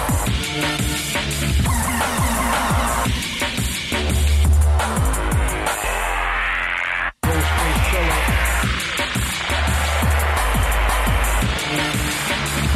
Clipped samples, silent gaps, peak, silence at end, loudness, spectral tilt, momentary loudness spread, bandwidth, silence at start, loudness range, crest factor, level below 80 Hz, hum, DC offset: under 0.1%; none; -6 dBFS; 0 s; -19 LUFS; -4 dB/octave; 3 LU; 15.5 kHz; 0 s; 1 LU; 12 dB; -22 dBFS; none; under 0.1%